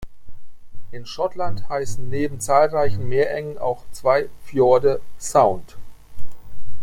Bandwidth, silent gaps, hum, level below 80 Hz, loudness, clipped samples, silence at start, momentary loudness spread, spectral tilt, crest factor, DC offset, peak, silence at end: 16.5 kHz; none; none; -42 dBFS; -21 LUFS; under 0.1%; 0 s; 11 LU; -5.5 dB/octave; 16 dB; under 0.1%; -2 dBFS; 0 s